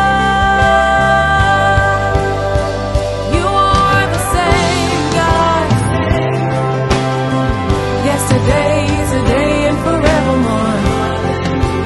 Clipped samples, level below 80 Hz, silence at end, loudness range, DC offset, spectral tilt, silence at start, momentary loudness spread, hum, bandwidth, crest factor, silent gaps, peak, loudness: under 0.1%; -24 dBFS; 0 s; 2 LU; under 0.1%; -5.5 dB/octave; 0 s; 5 LU; none; 12.5 kHz; 12 dB; none; 0 dBFS; -13 LUFS